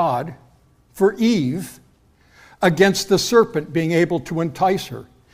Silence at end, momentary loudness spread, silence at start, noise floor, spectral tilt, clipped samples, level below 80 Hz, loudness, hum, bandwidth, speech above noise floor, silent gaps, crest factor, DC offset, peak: 0.3 s; 14 LU; 0 s; -55 dBFS; -5 dB/octave; under 0.1%; -54 dBFS; -19 LUFS; none; 16 kHz; 37 dB; none; 18 dB; under 0.1%; -2 dBFS